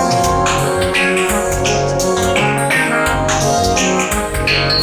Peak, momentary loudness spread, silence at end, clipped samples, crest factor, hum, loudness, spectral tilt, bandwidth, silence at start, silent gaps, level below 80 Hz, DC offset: -2 dBFS; 2 LU; 0 s; under 0.1%; 12 dB; none; -14 LUFS; -3.5 dB/octave; over 20 kHz; 0 s; none; -30 dBFS; under 0.1%